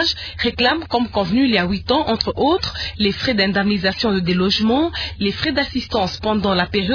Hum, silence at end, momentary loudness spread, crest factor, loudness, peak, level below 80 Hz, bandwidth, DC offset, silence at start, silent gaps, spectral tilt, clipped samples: none; 0 s; 5 LU; 18 dB; -18 LUFS; 0 dBFS; -38 dBFS; 5.4 kHz; under 0.1%; 0 s; none; -5.5 dB/octave; under 0.1%